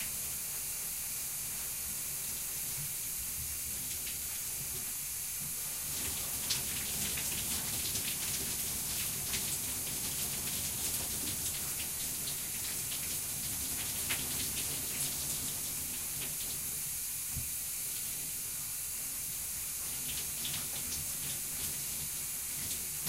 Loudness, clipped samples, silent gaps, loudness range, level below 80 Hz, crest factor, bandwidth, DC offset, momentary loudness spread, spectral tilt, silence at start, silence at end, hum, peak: -34 LUFS; under 0.1%; none; 2 LU; -56 dBFS; 18 dB; 16 kHz; under 0.1%; 3 LU; -0.5 dB/octave; 0 s; 0 s; none; -18 dBFS